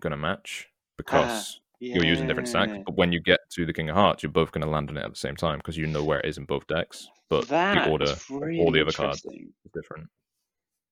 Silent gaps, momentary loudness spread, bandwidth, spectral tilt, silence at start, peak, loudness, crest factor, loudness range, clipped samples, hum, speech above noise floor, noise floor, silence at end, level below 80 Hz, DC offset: none; 17 LU; 15.5 kHz; -5 dB/octave; 0.05 s; -4 dBFS; -26 LUFS; 22 dB; 3 LU; under 0.1%; none; 59 dB; -85 dBFS; 0.85 s; -50 dBFS; under 0.1%